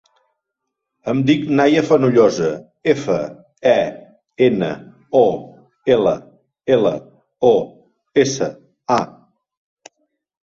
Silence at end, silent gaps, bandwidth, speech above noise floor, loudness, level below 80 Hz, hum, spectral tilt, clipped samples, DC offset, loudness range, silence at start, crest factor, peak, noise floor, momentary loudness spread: 1.35 s; none; 7.6 kHz; 63 dB; -17 LUFS; -58 dBFS; none; -6 dB/octave; under 0.1%; under 0.1%; 3 LU; 1.05 s; 16 dB; -2 dBFS; -79 dBFS; 15 LU